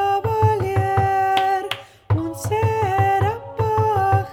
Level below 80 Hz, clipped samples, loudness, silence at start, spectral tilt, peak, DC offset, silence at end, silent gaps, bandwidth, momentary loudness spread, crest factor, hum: -44 dBFS; under 0.1%; -20 LUFS; 0 s; -6.5 dB/octave; -4 dBFS; under 0.1%; 0 s; none; 16 kHz; 6 LU; 16 dB; none